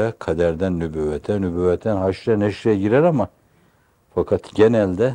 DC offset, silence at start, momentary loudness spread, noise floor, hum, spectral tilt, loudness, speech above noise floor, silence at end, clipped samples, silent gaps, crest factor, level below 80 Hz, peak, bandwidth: under 0.1%; 0 s; 8 LU; -58 dBFS; none; -8 dB/octave; -20 LUFS; 40 dB; 0 s; under 0.1%; none; 18 dB; -48 dBFS; -2 dBFS; 10 kHz